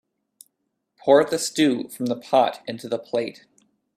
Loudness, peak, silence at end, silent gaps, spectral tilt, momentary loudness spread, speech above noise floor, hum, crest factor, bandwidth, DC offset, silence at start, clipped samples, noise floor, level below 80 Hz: -22 LUFS; -2 dBFS; 0.65 s; none; -4 dB/octave; 12 LU; 55 dB; none; 22 dB; 15 kHz; under 0.1%; 1.05 s; under 0.1%; -77 dBFS; -70 dBFS